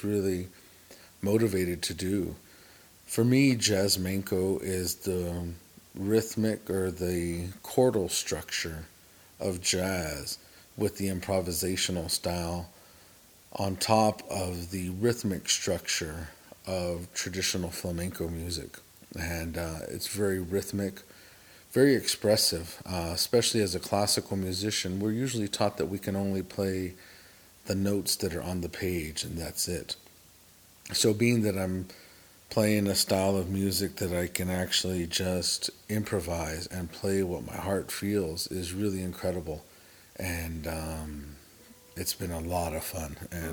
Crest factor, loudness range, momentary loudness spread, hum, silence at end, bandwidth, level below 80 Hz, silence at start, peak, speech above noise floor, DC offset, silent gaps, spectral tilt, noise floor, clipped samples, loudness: 22 dB; 6 LU; 13 LU; none; 0 s; over 20 kHz; -56 dBFS; 0 s; -8 dBFS; 27 dB; under 0.1%; none; -4 dB/octave; -57 dBFS; under 0.1%; -30 LUFS